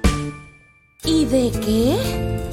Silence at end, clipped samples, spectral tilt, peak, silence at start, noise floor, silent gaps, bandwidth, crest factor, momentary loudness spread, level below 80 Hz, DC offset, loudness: 0 s; under 0.1%; -5.5 dB/octave; -6 dBFS; 0 s; -51 dBFS; none; 16.5 kHz; 14 dB; 11 LU; -30 dBFS; under 0.1%; -20 LUFS